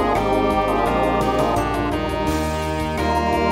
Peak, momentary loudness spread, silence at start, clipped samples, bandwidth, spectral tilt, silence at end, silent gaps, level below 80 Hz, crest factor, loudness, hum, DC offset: -6 dBFS; 4 LU; 0 s; under 0.1%; 16 kHz; -6 dB/octave; 0 s; none; -32 dBFS; 14 dB; -20 LUFS; none; under 0.1%